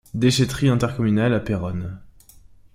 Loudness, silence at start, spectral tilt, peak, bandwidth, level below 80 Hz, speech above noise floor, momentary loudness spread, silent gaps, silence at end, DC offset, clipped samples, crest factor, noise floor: -21 LUFS; 0.15 s; -6 dB/octave; -4 dBFS; 15.5 kHz; -44 dBFS; 28 dB; 13 LU; none; 0.65 s; under 0.1%; under 0.1%; 16 dB; -48 dBFS